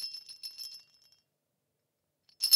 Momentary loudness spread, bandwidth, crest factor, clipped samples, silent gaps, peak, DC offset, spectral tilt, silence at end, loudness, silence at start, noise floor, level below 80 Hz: 16 LU; 18 kHz; 28 dB; under 0.1%; none; -10 dBFS; under 0.1%; 4.5 dB/octave; 0 s; -40 LUFS; 0 s; -82 dBFS; under -90 dBFS